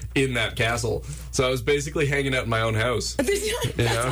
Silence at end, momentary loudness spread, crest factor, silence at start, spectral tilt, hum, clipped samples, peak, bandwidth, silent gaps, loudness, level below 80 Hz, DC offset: 0 s; 3 LU; 12 dB; 0 s; -4.5 dB/octave; none; under 0.1%; -12 dBFS; 19.5 kHz; none; -24 LUFS; -38 dBFS; under 0.1%